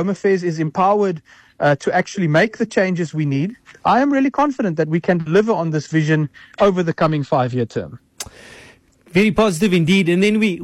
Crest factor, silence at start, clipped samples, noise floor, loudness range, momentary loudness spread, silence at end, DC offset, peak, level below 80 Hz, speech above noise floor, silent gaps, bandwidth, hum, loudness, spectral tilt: 12 dB; 0 s; under 0.1%; -48 dBFS; 2 LU; 9 LU; 0 s; under 0.1%; -6 dBFS; -50 dBFS; 31 dB; none; 14 kHz; none; -18 LUFS; -6.5 dB/octave